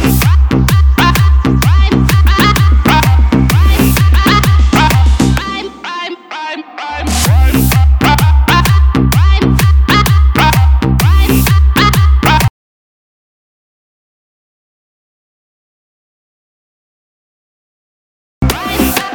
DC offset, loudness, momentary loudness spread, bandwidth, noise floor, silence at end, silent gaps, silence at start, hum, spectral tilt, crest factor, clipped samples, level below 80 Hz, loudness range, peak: under 0.1%; -9 LUFS; 10 LU; over 20 kHz; under -90 dBFS; 0 s; 12.50-18.41 s; 0 s; none; -5.5 dB/octave; 10 dB; under 0.1%; -14 dBFS; 6 LU; 0 dBFS